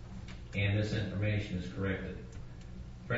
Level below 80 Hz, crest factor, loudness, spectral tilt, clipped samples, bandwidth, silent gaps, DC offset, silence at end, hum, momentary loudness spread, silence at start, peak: -48 dBFS; 16 dB; -35 LUFS; -6 dB/octave; under 0.1%; 7.6 kHz; none; under 0.1%; 0 s; none; 16 LU; 0 s; -20 dBFS